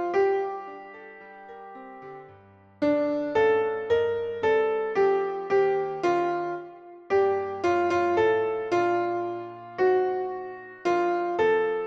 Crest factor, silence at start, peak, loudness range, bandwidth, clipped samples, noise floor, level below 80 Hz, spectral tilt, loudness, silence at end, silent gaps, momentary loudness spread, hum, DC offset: 14 dB; 0 s; -12 dBFS; 4 LU; 7.2 kHz; under 0.1%; -53 dBFS; -66 dBFS; -6 dB/octave; -25 LUFS; 0 s; none; 20 LU; none; under 0.1%